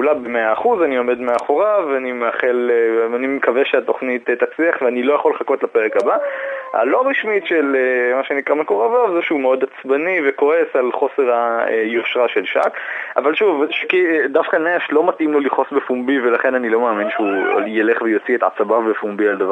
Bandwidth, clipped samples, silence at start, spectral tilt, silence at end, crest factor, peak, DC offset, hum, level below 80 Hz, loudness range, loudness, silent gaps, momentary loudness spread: 8.8 kHz; under 0.1%; 0 s; -5.5 dB/octave; 0 s; 16 dB; 0 dBFS; under 0.1%; none; -70 dBFS; 1 LU; -17 LUFS; none; 4 LU